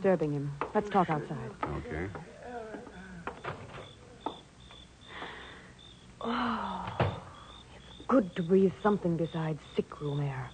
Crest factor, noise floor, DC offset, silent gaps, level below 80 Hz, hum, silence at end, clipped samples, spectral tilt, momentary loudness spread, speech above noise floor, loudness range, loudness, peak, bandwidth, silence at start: 18 dB; -53 dBFS; under 0.1%; none; -56 dBFS; none; 0 s; under 0.1%; -7.5 dB/octave; 22 LU; 22 dB; 13 LU; -33 LUFS; -14 dBFS; 9.4 kHz; 0 s